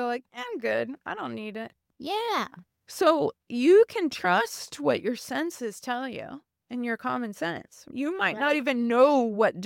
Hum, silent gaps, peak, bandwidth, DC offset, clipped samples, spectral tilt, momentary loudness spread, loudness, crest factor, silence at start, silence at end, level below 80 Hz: none; none; -8 dBFS; 17 kHz; under 0.1%; under 0.1%; -4.5 dB/octave; 18 LU; -26 LUFS; 18 dB; 0 s; 0 s; -74 dBFS